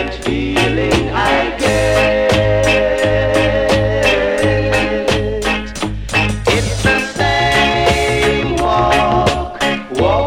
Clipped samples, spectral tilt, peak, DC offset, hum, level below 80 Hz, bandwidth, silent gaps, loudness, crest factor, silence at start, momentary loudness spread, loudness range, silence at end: under 0.1%; -5 dB/octave; 0 dBFS; under 0.1%; none; -26 dBFS; 16.5 kHz; none; -14 LUFS; 14 dB; 0 s; 5 LU; 2 LU; 0 s